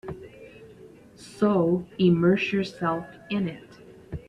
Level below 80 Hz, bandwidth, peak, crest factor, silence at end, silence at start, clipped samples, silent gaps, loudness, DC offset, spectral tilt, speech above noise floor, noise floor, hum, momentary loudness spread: -56 dBFS; 10.5 kHz; -10 dBFS; 16 dB; 0.05 s; 0.05 s; under 0.1%; none; -25 LUFS; under 0.1%; -7.5 dB/octave; 25 dB; -49 dBFS; none; 21 LU